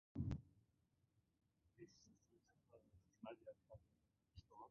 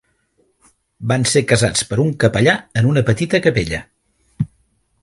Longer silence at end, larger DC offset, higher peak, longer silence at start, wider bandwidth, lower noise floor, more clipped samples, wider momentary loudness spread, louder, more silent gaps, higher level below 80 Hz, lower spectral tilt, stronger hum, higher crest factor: second, 0 s vs 0.55 s; neither; second, -34 dBFS vs 0 dBFS; second, 0.15 s vs 1 s; second, 6.6 kHz vs 11.5 kHz; first, -84 dBFS vs -62 dBFS; neither; first, 19 LU vs 12 LU; second, -56 LUFS vs -17 LUFS; neither; second, -66 dBFS vs -42 dBFS; first, -8.5 dB/octave vs -5 dB/octave; neither; first, 24 dB vs 18 dB